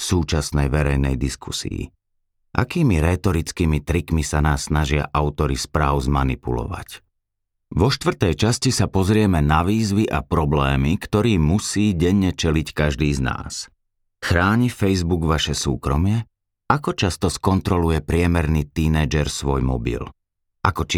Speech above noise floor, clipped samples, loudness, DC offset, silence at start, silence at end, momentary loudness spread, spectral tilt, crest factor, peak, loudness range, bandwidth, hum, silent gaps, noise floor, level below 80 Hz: 57 dB; under 0.1%; -20 LUFS; under 0.1%; 0 s; 0 s; 9 LU; -5.5 dB/octave; 18 dB; -2 dBFS; 3 LU; 16 kHz; none; none; -77 dBFS; -30 dBFS